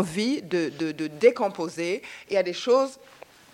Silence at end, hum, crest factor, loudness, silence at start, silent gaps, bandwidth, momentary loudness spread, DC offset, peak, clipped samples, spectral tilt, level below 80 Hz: 0.6 s; none; 20 dB; -25 LUFS; 0 s; none; 13.5 kHz; 9 LU; under 0.1%; -6 dBFS; under 0.1%; -5 dB/octave; -68 dBFS